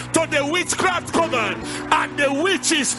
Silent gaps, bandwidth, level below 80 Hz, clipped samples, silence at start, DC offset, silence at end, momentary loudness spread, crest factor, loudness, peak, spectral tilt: none; 12 kHz; -50 dBFS; under 0.1%; 0 s; under 0.1%; 0 s; 3 LU; 20 dB; -20 LUFS; -2 dBFS; -2.5 dB/octave